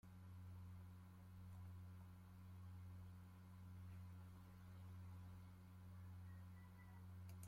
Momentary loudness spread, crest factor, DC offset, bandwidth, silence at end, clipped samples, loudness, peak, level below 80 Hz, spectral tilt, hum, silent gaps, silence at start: 4 LU; 14 dB; under 0.1%; 16.5 kHz; 0 s; under 0.1%; -61 LUFS; -44 dBFS; -76 dBFS; -7 dB/octave; none; none; 0.05 s